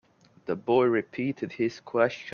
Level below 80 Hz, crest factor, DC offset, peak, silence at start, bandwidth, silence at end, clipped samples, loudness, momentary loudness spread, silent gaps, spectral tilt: -72 dBFS; 20 dB; under 0.1%; -8 dBFS; 0.5 s; 6.8 kHz; 0 s; under 0.1%; -27 LUFS; 10 LU; none; -7 dB/octave